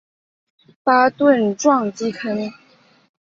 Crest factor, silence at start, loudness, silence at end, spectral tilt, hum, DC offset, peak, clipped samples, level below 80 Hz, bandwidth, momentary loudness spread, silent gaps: 18 dB; 0.85 s; -18 LUFS; 0.75 s; -5 dB/octave; none; under 0.1%; -2 dBFS; under 0.1%; -66 dBFS; 7.6 kHz; 10 LU; none